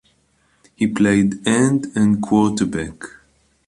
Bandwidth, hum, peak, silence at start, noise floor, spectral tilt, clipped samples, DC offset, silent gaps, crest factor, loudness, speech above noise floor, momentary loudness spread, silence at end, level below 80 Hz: 11.5 kHz; none; -2 dBFS; 0.8 s; -61 dBFS; -5.5 dB/octave; under 0.1%; under 0.1%; none; 16 dB; -18 LUFS; 44 dB; 13 LU; 0.6 s; -48 dBFS